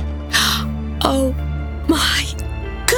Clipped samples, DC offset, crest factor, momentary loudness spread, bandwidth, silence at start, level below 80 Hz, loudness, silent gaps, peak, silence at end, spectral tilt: under 0.1%; under 0.1%; 18 dB; 9 LU; 19.5 kHz; 0 s; -26 dBFS; -19 LUFS; none; 0 dBFS; 0 s; -3.5 dB/octave